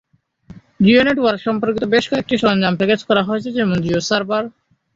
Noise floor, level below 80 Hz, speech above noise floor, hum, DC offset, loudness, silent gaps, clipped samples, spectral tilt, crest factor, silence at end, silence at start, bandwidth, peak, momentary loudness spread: -44 dBFS; -50 dBFS; 28 dB; none; under 0.1%; -17 LUFS; none; under 0.1%; -5.5 dB/octave; 16 dB; 0.45 s; 0.5 s; 7.8 kHz; -2 dBFS; 7 LU